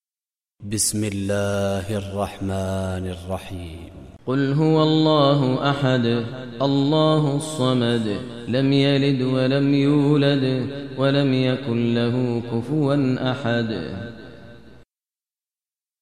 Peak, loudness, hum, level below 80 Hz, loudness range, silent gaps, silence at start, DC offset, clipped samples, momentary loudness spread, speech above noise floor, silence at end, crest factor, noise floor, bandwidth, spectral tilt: -6 dBFS; -21 LUFS; none; -52 dBFS; 6 LU; none; 0.6 s; 0.3%; under 0.1%; 13 LU; over 70 dB; 1.3 s; 16 dB; under -90 dBFS; 15 kHz; -6 dB/octave